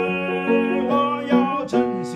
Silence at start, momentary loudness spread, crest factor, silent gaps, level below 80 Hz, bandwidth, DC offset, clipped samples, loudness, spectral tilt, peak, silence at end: 0 s; 2 LU; 14 dB; none; -58 dBFS; 9.8 kHz; under 0.1%; under 0.1%; -20 LUFS; -6.5 dB/octave; -6 dBFS; 0 s